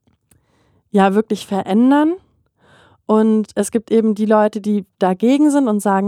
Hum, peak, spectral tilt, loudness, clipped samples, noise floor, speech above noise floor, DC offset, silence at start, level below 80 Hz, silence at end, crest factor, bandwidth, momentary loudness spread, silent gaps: none; 0 dBFS; -6.5 dB/octave; -16 LUFS; under 0.1%; -59 dBFS; 44 dB; under 0.1%; 0.95 s; -64 dBFS; 0 s; 16 dB; 14.5 kHz; 8 LU; none